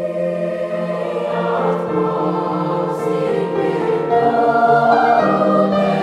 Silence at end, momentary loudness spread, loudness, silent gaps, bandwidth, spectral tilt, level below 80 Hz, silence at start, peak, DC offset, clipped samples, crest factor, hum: 0 s; 8 LU; -17 LUFS; none; 11.5 kHz; -7.5 dB/octave; -56 dBFS; 0 s; -2 dBFS; under 0.1%; under 0.1%; 14 dB; none